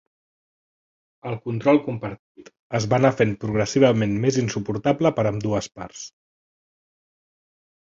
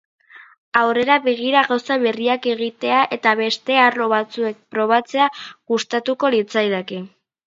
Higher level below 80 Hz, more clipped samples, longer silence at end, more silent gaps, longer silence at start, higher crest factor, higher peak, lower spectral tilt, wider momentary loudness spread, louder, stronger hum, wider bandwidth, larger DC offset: first, -54 dBFS vs -70 dBFS; neither; first, 1.85 s vs 0.4 s; first, 2.19-2.35 s, 2.59-2.70 s vs 0.58-0.72 s; first, 1.25 s vs 0.35 s; about the same, 22 dB vs 18 dB; about the same, -2 dBFS vs 0 dBFS; first, -6 dB/octave vs -4 dB/octave; first, 17 LU vs 8 LU; second, -22 LUFS vs -18 LUFS; neither; about the same, 7.8 kHz vs 7.8 kHz; neither